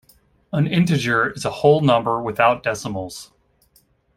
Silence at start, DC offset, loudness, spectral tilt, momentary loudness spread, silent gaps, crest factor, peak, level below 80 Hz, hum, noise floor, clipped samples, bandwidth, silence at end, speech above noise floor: 0.55 s; under 0.1%; -19 LUFS; -6 dB/octave; 12 LU; none; 18 dB; -2 dBFS; -54 dBFS; none; -60 dBFS; under 0.1%; 16 kHz; 0.95 s; 41 dB